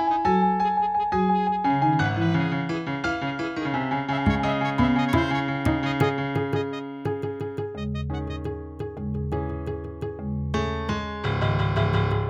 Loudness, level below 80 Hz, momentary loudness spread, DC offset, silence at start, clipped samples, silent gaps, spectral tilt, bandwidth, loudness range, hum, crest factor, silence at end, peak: -25 LUFS; -40 dBFS; 10 LU; under 0.1%; 0 s; under 0.1%; none; -7.5 dB/octave; 12 kHz; 7 LU; none; 18 dB; 0 s; -8 dBFS